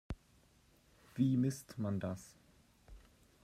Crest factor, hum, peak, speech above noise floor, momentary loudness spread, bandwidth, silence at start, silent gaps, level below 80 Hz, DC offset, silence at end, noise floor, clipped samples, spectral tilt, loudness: 20 dB; none; -22 dBFS; 33 dB; 18 LU; 15 kHz; 0.1 s; none; -60 dBFS; under 0.1%; 0.45 s; -69 dBFS; under 0.1%; -7.5 dB/octave; -37 LUFS